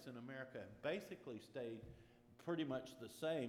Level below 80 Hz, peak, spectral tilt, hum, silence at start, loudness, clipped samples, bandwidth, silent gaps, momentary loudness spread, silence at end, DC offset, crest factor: -76 dBFS; -32 dBFS; -6 dB/octave; none; 0 s; -49 LUFS; under 0.1%; 17.5 kHz; none; 12 LU; 0 s; under 0.1%; 16 dB